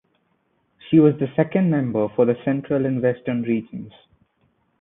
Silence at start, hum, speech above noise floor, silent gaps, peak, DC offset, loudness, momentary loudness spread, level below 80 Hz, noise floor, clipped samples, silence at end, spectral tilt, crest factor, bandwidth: 0.85 s; none; 47 dB; none; -4 dBFS; under 0.1%; -20 LUFS; 9 LU; -62 dBFS; -67 dBFS; under 0.1%; 0.9 s; -13 dB/octave; 18 dB; 3.9 kHz